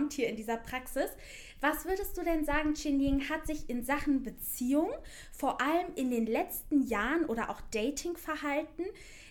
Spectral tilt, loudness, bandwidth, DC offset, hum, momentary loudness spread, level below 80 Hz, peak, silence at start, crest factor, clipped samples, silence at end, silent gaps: -4 dB/octave; -33 LUFS; 19 kHz; under 0.1%; none; 7 LU; -48 dBFS; -16 dBFS; 0 s; 16 dB; under 0.1%; 0 s; none